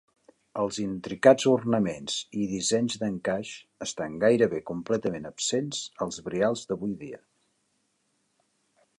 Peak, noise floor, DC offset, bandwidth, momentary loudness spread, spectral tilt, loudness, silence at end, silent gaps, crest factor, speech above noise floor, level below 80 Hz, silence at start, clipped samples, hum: -4 dBFS; -73 dBFS; under 0.1%; 11.5 kHz; 12 LU; -4.5 dB/octave; -27 LUFS; 1.85 s; none; 24 dB; 47 dB; -64 dBFS; 0.55 s; under 0.1%; none